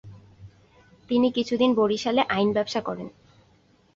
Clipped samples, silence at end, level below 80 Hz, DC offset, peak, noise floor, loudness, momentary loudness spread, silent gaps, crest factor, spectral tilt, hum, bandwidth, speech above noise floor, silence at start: under 0.1%; 0.85 s; -60 dBFS; under 0.1%; -8 dBFS; -60 dBFS; -24 LUFS; 12 LU; none; 18 dB; -5.5 dB/octave; none; 7.6 kHz; 37 dB; 0.05 s